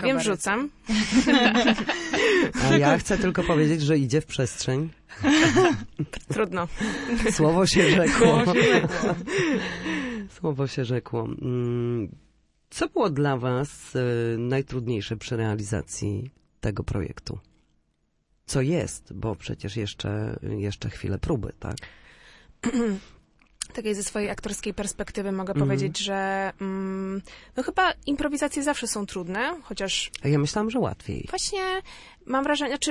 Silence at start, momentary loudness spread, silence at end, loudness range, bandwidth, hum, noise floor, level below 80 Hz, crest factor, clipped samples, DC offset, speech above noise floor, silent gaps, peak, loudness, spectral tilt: 0 s; 13 LU; 0 s; 10 LU; 11.5 kHz; none; -71 dBFS; -46 dBFS; 22 dB; under 0.1%; under 0.1%; 46 dB; none; -4 dBFS; -25 LUFS; -5 dB/octave